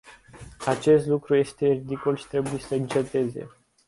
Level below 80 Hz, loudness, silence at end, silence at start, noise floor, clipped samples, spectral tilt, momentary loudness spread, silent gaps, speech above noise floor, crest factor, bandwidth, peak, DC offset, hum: -56 dBFS; -25 LUFS; 0.4 s; 0.05 s; -46 dBFS; under 0.1%; -6.5 dB/octave; 10 LU; none; 22 dB; 18 dB; 11.5 kHz; -8 dBFS; under 0.1%; none